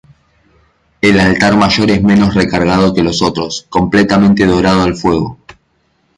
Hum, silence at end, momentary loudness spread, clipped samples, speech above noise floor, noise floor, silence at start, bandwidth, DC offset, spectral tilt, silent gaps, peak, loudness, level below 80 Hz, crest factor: none; 0.65 s; 6 LU; under 0.1%; 48 dB; -58 dBFS; 1.05 s; 11 kHz; under 0.1%; -6 dB/octave; none; 0 dBFS; -11 LUFS; -34 dBFS; 12 dB